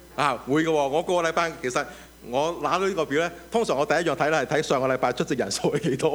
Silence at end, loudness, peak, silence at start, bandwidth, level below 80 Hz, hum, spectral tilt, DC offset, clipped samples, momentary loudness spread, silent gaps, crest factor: 0 s; -24 LUFS; -6 dBFS; 0 s; over 20 kHz; -54 dBFS; none; -4.5 dB/octave; under 0.1%; under 0.1%; 4 LU; none; 18 dB